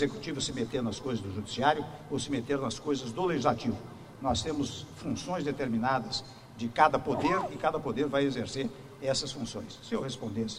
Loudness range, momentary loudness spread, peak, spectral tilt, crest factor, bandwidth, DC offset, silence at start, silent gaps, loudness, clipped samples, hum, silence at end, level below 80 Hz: 3 LU; 9 LU; -8 dBFS; -5 dB/octave; 24 dB; 15 kHz; under 0.1%; 0 s; none; -32 LUFS; under 0.1%; none; 0 s; -56 dBFS